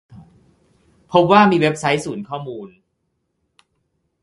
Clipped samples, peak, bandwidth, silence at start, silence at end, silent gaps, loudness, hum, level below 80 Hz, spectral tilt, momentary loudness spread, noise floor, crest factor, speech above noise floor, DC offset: under 0.1%; 0 dBFS; 11.5 kHz; 0.1 s; 1.55 s; none; -16 LUFS; none; -58 dBFS; -6 dB/octave; 18 LU; -71 dBFS; 20 dB; 55 dB; under 0.1%